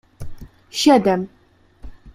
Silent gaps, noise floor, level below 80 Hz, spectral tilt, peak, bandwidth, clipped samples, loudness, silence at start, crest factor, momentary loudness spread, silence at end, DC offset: none; -44 dBFS; -44 dBFS; -4.5 dB/octave; -2 dBFS; 16 kHz; under 0.1%; -17 LUFS; 0.2 s; 20 dB; 25 LU; 0.05 s; under 0.1%